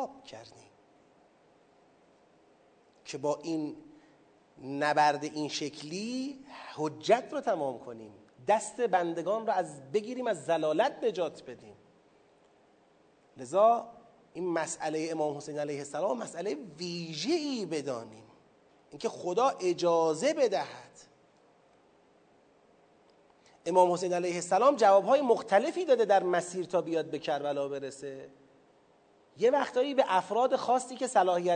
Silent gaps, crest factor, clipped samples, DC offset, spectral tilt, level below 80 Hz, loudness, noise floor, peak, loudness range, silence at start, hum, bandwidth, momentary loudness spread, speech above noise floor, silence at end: none; 20 dB; under 0.1%; under 0.1%; -4.5 dB/octave; -82 dBFS; -30 LUFS; -64 dBFS; -10 dBFS; 9 LU; 0 s; none; 9.4 kHz; 17 LU; 34 dB; 0 s